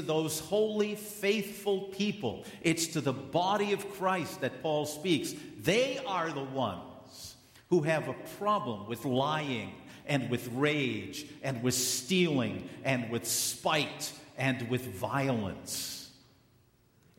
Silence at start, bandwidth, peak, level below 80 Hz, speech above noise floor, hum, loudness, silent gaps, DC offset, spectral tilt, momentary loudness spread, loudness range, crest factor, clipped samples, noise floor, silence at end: 0 s; 16 kHz; -14 dBFS; -68 dBFS; 34 dB; none; -32 LUFS; none; under 0.1%; -4 dB/octave; 10 LU; 2 LU; 18 dB; under 0.1%; -66 dBFS; 1.05 s